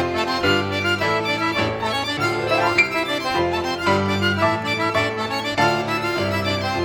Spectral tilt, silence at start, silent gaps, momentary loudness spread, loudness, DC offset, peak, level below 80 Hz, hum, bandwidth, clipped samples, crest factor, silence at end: -4.5 dB/octave; 0 s; none; 4 LU; -20 LUFS; under 0.1%; -4 dBFS; -50 dBFS; none; over 20 kHz; under 0.1%; 18 dB; 0 s